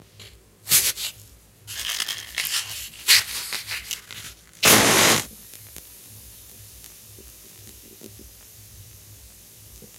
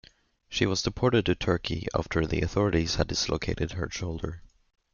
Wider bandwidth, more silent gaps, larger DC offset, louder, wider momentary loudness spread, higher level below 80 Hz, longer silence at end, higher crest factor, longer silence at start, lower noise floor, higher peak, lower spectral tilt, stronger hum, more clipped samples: first, 17 kHz vs 7.4 kHz; neither; neither; first, -20 LUFS vs -28 LUFS; first, 28 LU vs 9 LU; second, -54 dBFS vs -42 dBFS; second, 0.15 s vs 0.55 s; first, 26 dB vs 20 dB; second, 0.2 s vs 0.5 s; second, -49 dBFS vs -56 dBFS; first, 0 dBFS vs -8 dBFS; second, -1 dB/octave vs -5 dB/octave; neither; neither